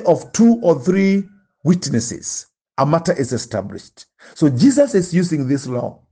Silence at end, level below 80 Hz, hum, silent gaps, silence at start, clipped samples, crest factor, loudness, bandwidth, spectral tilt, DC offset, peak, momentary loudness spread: 0.2 s; -56 dBFS; none; 2.61-2.65 s; 0 s; under 0.1%; 14 dB; -17 LUFS; 10 kHz; -6 dB/octave; under 0.1%; -2 dBFS; 13 LU